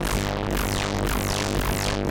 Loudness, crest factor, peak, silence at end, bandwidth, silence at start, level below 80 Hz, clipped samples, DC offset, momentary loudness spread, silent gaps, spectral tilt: -25 LUFS; 12 dB; -12 dBFS; 0 s; 17 kHz; 0 s; -30 dBFS; under 0.1%; 0.2%; 1 LU; none; -4.5 dB/octave